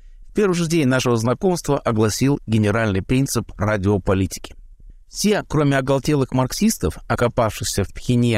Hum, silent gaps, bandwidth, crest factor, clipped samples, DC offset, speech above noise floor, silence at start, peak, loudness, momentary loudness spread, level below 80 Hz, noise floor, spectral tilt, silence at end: none; none; 16 kHz; 12 dB; under 0.1%; 0.1%; 23 dB; 0.05 s; -8 dBFS; -20 LUFS; 5 LU; -38 dBFS; -42 dBFS; -5.5 dB/octave; 0 s